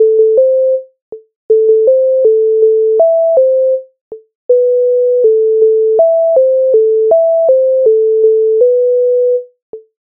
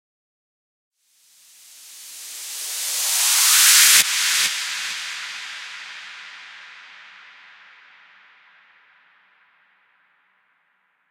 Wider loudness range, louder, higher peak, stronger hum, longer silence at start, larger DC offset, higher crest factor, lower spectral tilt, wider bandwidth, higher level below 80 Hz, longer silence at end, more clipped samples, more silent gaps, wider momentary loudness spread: second, 1 LU vs 20 LU; first, -10 LUFS vs -16 LUFS; about the same, 0 dBFS vs 0 dBFS; neither; second, 0 s vs 1.85 s; neither; second, 8 dB vs 24 dB; first, -9 dB/octave vs 5 dB/octave; second, 1.1 kHz vs 16 kHz; first, -68 dBFS vs -76 dBFS; second, 0.2 s vs 4.1 s; neither; first, 1.02-1.12 s, 1.36-1.49 s, 4.01-4.11 s, 4.35-4.49 s, 9.62-9.73 s vs none; second, 4 LU vs 28 LU